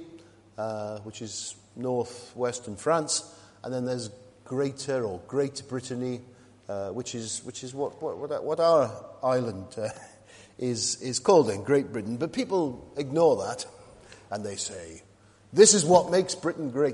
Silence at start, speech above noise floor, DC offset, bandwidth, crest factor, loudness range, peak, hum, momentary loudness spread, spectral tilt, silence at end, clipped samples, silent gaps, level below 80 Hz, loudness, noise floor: 0 s; 24 dB; under 0.1%; 11.5 kHz; 22 dB; 8 LU; -4 dBFS; none; 16 LU; -4 dB/octave; 0 s; under 0.1%; none; -66 dBFS; -27 LUFS; -51 dBFS